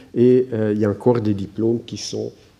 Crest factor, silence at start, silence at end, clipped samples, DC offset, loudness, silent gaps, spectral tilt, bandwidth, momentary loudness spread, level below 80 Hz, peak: 16 dB; 0.15 s; 0.3 s; under 0.1%; under 0.1%; -20 LUFS; none; -7 dB/octave; 10.5 kHz; 12 LU; -58 dBFS; -4 dBFS